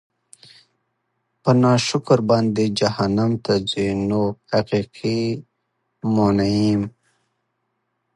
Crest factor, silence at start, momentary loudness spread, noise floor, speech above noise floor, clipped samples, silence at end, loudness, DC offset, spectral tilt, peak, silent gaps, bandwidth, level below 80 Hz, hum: 18 dB; 1.45 s; 7 LU; -73 dBFS; 55 dB; under 0.1%; 1.25 s; -20 LUFS; under 0.1%; -6.5 dB/octave; -2 dBFS; none; 11.5 kHz; -50 dBFS; none